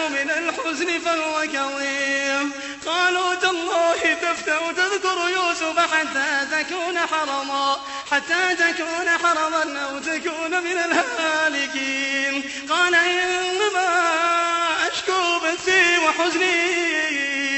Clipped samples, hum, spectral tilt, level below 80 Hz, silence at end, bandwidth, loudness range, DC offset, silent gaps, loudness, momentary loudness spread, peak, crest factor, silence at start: under 0.1%; none; -0.5 dB/octave; -62 dBFS; 0 s; 8.4 kHz; 3 LU; under 0.1%; none; -20 LUFS; 6 LU; -4 dBFS; 18 dB; 0 s